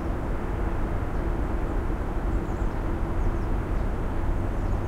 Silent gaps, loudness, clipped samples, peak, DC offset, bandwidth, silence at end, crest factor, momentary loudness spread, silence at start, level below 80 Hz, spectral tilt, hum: none; -30 LUFS; under 0.1%; -14 dBFS; under 0.1%; 9.4 kHz; 0 s; 12 dB; 1 LU; 0 s; -28 dBFS; -8.5 dB/octave; none